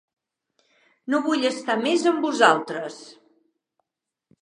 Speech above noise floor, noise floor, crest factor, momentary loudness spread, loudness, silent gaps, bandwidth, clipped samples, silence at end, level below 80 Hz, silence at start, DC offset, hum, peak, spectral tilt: 64 dB; -86 dBFS; 24 dB; 17 LU; -22 LUFS; none; 11 kHz; under 0.1%; 1.3 s; -84 dBFS; 1.05 s; under 0.1%; none; -2 dBFS; -3.5 dB/octave